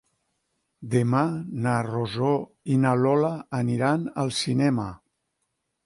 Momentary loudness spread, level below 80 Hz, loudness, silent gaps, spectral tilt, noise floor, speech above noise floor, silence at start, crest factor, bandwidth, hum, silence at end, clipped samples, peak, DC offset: 7 LU; -60 dBFS; -25 LUFS; none; -6.5 dB/octave; -78 dBFS; 54 dB; 0.8 s; 16 dB; 11.5 kHz; none; 0.9 s; under 0.1%; -10 dBFS; under 0.1%